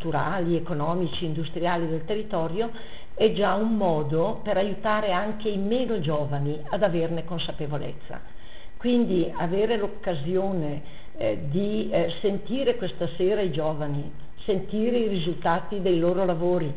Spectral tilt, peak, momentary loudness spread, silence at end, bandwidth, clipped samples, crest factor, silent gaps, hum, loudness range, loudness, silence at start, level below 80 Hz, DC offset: -10.5 dB/octave; -8 dBFS; 8 LU; 0 s; 4 kHz; under 0.1%; 18 dB; none; none; 2 LU; -26 LUFS; 0 s; -48 dBFS; 3%